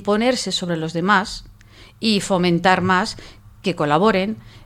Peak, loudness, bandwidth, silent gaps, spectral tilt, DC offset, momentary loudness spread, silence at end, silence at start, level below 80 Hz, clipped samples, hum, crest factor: 0 dBFS; -19 LUFS; 15 kHz; none; -5 dB/octave; under 0.1%; 11 LU; 0.05 s; 0 s; -46 dBFS; under 0.1%; none; 18 dB